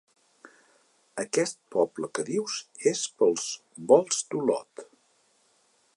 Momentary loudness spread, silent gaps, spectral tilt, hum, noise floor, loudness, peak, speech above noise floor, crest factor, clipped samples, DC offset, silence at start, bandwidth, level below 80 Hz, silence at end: 15 LU; none; -3.5 dB/octave; none; -67 dBFS; -27 LUFS; -6 dBFS; 40 dB; 24 dB; under 0.1%; under 0.1%; 1.15 s; 11.5 kHz; -84 dBFS; 1.1 s